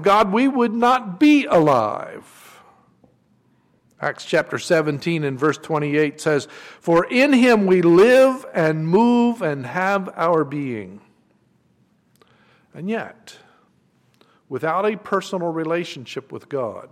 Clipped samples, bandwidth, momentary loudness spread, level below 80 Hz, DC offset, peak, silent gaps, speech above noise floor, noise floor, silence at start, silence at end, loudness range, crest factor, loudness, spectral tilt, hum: under 0.1%; 15.5 kHz; 16 LU; -60 dBFS; under 0.1%; -6 dBFS; none; 42 dB; -61 dBFS; 0 s; 0.05 s; 14 LU; 14 dB; -19 LUFS; -6 dB/octave; none